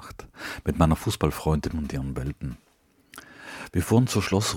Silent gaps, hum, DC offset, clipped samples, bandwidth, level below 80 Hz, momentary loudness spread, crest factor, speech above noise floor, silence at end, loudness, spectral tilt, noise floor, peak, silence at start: none; none; under 0.1%; under 0.1%; 18 kHz; -38 dBFS; 21 LU; 22 dB; 31 dB; 0 s; -26 LUFS; -5.5 dB/octave; -56 dBFS; -4 dBFS; 0 s